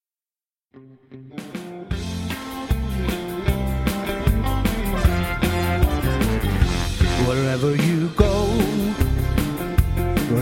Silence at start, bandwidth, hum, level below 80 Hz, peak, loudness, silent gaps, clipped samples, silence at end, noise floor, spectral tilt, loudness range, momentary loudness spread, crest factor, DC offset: 0.75 s; 16.5 kHz; none; -26 dBFS; -2 dBFS; -22 LUFS; none; under 0.1%; 0 s; under -90 dBFS; -6 dB/octave; 7 LU; 10 LU; 20 dB; under 0.1%